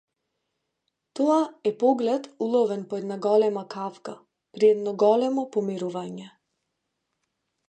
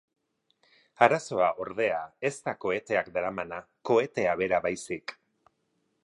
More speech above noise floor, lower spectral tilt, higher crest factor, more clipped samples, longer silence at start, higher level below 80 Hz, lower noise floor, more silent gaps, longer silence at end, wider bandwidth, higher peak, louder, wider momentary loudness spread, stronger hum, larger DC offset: first, 56 dB vs 47 dB; first, -6.5 dB/octave vs -5 dB/octave; second, 18 dB vs 26 dB; neither; first, 1.15 s vs 1 s; second, -80 dBFS vs -66 dBFS; first, -80 dBFS vs -75 dBFS; neither; first, 1.4 s vs 0.9 s; second, 9 kHz vs 11.5 kHz; second, -8 dBFS vs -4 dBFS; first, -24 LUFS vs -28 LUFS; about the same, 14 LU vs 13 LU; neither; neither